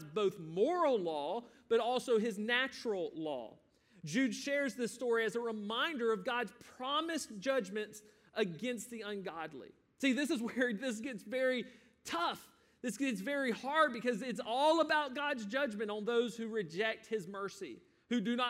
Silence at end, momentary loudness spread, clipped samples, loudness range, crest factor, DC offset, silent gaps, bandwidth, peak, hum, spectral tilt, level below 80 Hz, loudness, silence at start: 0 s; 12 LU; under 0.1%; 4 LU; 20 dB; under 0.1%; none; 16 kHz; -16 dBFS; none; -4 dB/octave; -82 dBFS; -36 LUFS; 0 s